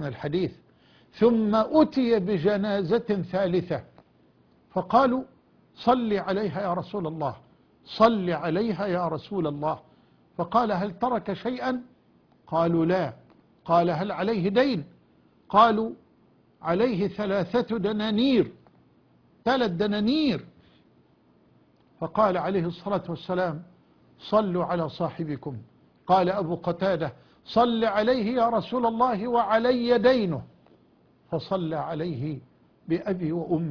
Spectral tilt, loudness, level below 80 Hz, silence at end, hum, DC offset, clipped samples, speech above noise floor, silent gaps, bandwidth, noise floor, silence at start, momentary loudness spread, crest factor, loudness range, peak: -8 dB/octave; -25 LUFS; -58 dBFS; 0 s; none; under 0.1%; under 0.1%; 36 dB; none; 5.4 kHz; -61 dBFS; 0 s; 12 LU; 20 dB; 5 LU; -6 dBFS